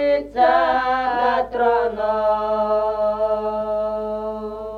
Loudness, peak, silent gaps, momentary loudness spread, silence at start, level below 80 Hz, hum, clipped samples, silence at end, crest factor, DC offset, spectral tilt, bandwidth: -20 LUFS; -4 dBFS; none; 8 LU; 0 s; -46 dBFS; 50 Hz at -45 dBFS; under 0.1%; 0 s; 16 dB; under 0.1%; -6 dB/octave; 6.4 kHz